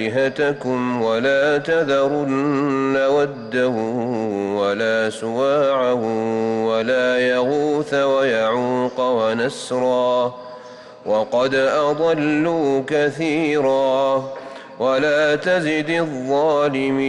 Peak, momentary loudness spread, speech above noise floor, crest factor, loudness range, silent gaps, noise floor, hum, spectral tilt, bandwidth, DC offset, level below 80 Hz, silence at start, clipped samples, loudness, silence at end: -10 dBFS; 5 LU; 20 dB; 10 dB; 1 LU; none; -39 dBFS; none; -5.5 dB/octave; 11 kHz; under 0.1%; -62 dBFS; 0 s; under 0.1%; -19 LUFS; 0 s